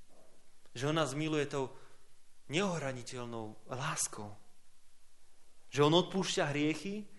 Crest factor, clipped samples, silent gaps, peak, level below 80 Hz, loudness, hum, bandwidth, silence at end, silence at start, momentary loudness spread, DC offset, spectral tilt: 24 dB; under 0.1%; none; -12 dBFS; -66 dBFS; -35 LUFS; none; 11.5 kHz; 0 s; 0 s; 15 LU; under 0.1%; -4.5 dB/octave